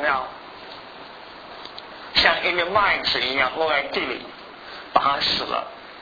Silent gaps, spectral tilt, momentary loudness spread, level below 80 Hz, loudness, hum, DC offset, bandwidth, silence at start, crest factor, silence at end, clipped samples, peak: none; -3.5 dB/octave; 21 LU; -52 dBFS; -21 LUFS; none; under 0.1%; 5 kHz; 0 s; 24 dB; 0 s; under 0.1%; -2 dBFS